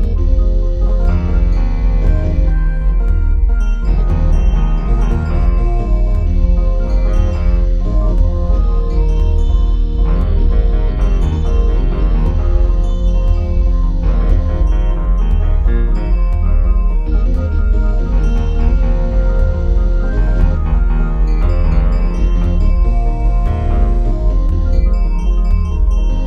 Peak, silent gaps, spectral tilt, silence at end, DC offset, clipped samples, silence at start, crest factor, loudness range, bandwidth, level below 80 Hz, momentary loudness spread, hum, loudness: 0 dBFS; none; -9 dB/octave; 0 s; under 0.1%; under 0.1%; 0 s; 10 dB; 0 LU; 3.7 kHz; -12 dBFS; 2 LU; none; -16 LUFS